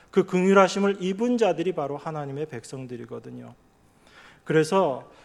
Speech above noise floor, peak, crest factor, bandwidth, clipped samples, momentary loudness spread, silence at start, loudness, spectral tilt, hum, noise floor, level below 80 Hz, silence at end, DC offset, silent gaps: 33 dB; -4 dBFS; 22 dB; 12 kHz; under 0.1%; 19 LU; 0.15 s; -24 LUFS; -6 dB/octave; none; -57 dBFS; -66 dBFS; 0.2 s; under 0.1%; none